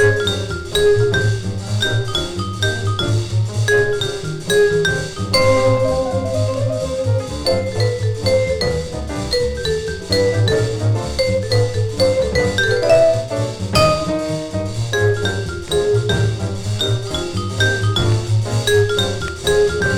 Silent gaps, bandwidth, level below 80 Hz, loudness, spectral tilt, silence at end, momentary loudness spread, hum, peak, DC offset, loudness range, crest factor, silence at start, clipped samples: none; 15 kHz; -34 dBFS; -18 LUFS; -5 dB/octave; 0 s; 8 LU; none; 0 dBFS; under 0.1%; 3 LU; 16 dB; 0 s; under 0.1%